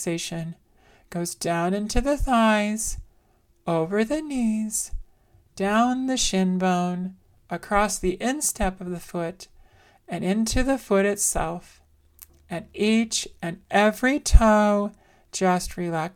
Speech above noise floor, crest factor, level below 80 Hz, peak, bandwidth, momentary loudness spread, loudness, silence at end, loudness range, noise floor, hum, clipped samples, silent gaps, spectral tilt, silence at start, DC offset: 38 dB; 24 dB; -32 dBFS; 0 dBFS; 18 kHz; 15 LU; -24 LUFS; 0.05 s; 4 LU; -61 dBFS; none; under 0.1%; none; -4.5 dB/octave; 0 s; under 0.1%